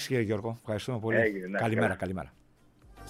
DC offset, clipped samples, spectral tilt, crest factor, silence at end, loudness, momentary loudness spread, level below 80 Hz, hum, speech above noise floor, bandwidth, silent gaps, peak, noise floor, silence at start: under 0.1%; under 0.1%; -6 dB/octave; 18 dB; 0 s; -30 LUFS; 9 LU; -60 dBFS; none; 30 dB; 15.5 kHz; none; -12 dBFS; -60 dBFS; 0 s